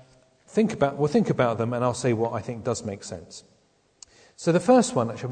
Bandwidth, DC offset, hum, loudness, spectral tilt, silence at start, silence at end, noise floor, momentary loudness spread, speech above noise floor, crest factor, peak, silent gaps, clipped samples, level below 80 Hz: 9.4 kHz; under 0.1%; none; -24 LUFS; -6 dB/octave; 0.55 s; 0 s; -64 dBFS; 17 LU; 40 dB; 20 dB; -6 dBFS; none; under 0.1%; -60 dBFS